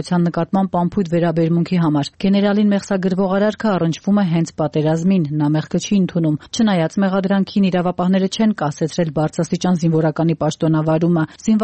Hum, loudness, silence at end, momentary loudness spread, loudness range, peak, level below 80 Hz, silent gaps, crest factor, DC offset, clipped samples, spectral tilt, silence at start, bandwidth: none; -18 LUFS; 0 s; 3 LU; 1 LU; -6 dBFS; -52 dBFS; none; 10 dB; 0.1%; under 0.1%; -7 dB/octave; 0 s; 8.8 kHz